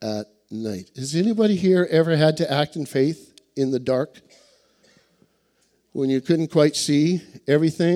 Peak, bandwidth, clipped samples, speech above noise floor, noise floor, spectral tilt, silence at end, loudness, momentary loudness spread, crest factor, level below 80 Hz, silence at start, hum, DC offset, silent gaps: -4 dBFS; 15 kHz; under 0.1%; 45 dB; -66 dBFS; -6 dB/octave; 0 s; -21 LUFS; 14 LU; 18 dB; -64 dBFS; 0 s; none; under 0.1%; none